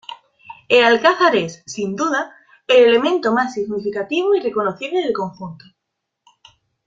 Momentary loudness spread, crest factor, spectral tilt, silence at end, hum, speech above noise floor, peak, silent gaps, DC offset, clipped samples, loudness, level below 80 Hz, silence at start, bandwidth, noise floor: 15 LU; 18 dB; -4 dB/octave; 1.3 s; none; 61 dB; -2 dBFS; none; under 0.1%; under 0.1%; -17 LUFS; -64 dBFS; 0.1 s; 7.6 kHz; -78 dBFS